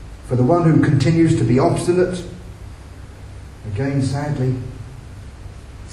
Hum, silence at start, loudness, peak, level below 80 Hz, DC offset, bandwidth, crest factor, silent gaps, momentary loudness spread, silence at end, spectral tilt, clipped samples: none; 0 s; -18 LUFS; -2 dBFS; -38 dBFS; under 0.1%; 12 kHz; 18 dB; none; 23 LU; 0.05 s; -7.5 dB/octave; under 0.1%